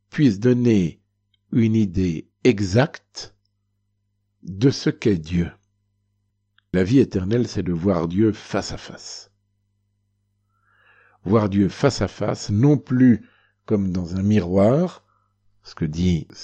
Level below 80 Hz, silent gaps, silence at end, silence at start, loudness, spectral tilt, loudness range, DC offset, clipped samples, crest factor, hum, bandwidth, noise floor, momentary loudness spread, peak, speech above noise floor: -48 dBFS; none; 0 s; 0.15 s; -21 LUFS; -7 dB/octave; 6 LU; under 0.1%; under 0.1%; 18 dB; 50 Hz at -50 dBFS; 8.6 kHz; -71 dBFS; 16 LU; -4 dBFS; 52 dB